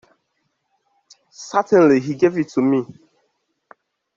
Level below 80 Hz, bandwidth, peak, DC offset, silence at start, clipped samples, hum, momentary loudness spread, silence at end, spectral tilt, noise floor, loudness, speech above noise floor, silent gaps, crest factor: -64 dBFS; 7.6 kHz; -2 dBFS; under 0.1%; 1.4 s; under 0.1%; none; 13 LU; 1.25 s; -7 dB/octave; -71 dBFS; -17 LUFS; 55 dB; none; 18 dB